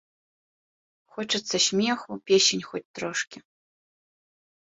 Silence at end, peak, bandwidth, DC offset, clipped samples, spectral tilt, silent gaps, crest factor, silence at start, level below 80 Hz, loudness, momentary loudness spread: 1.25 s; -8 dBFS; 8 kHz; under 0.1%; under 0.1%; -2 dB/octave; 2.85-2.94 s; 22 dB; 1.15 s; -70 dBFS; -24 LUFS; 16 LU